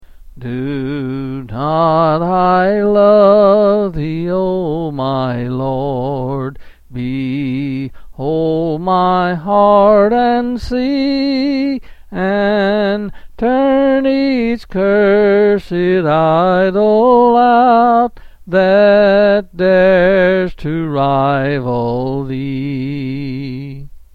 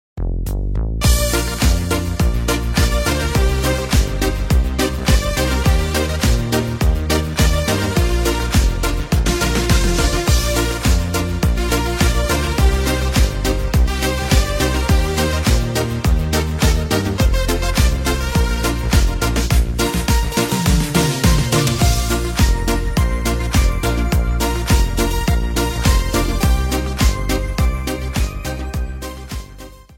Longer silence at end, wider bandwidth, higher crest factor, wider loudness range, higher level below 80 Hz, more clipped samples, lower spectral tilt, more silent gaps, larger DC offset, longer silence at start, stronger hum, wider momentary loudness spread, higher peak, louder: about the same, 0.15 s vs 0.2 s; second, 6.6 kHz vs 16.5 kHz; about the same, 12 dB vs 16 dB; first, 8 LU vs 2 LU; second, -38 dBFS vs -18 dBFS; neither; first, -8.5 dB/octave vs -4.5 dB/octave; neither; neither; about the same, 0.25 s vs 0.15 s; neither; first, 13 LU vs 4 LU; about the same, 0 dBFS vs 0 dBFS; first, -13 LUFS vs -18 LUFS